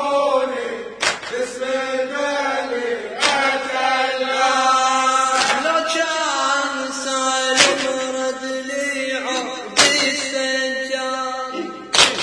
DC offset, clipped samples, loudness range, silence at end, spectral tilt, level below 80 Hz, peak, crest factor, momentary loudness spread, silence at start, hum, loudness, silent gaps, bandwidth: under 0.1%; under 0.1%; 3 LU; 0 s; -0.5 dB/octave; -60 dBFS; 0 dBFS; 20 dB; 10 LU; 0 s; none; -19 LUFS; none; 11 kHz